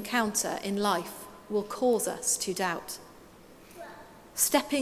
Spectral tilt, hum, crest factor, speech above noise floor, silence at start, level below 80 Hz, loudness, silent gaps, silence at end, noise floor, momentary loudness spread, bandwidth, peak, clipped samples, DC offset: -2.5 dB/octave; none; 22 dB; 23 dB; 0 s; -64 dBFS; -29 LUFS; none; 0 s; -52 dBFS; 21 LU; 16 kHz; -8 dBFS; under 0.1%; under 0.1%